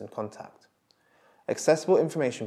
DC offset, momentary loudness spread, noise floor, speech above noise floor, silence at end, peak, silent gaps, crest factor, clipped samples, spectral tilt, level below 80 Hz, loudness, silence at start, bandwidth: under 0.1%; 22 LU; -66 dBFS; 39 dB; 0 s; -8 dBFS; none; 20 dB; under 0.1%; -5 dB/octave; -84 dBFS; -26 LUFS; 0 s; 13.5 kHz